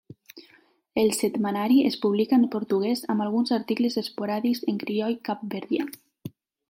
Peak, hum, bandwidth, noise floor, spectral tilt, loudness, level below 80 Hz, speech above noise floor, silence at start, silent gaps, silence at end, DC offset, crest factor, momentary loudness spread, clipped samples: -10 dBFS; none; 16.5 kHz; -60 dBFS; -5 dB/octave; -25 LUFS; -70 dBFS; 36 dB; 0.35 s; none; 0.4 s; under 0.1%; 16 dB; 11 LU; under 0.1%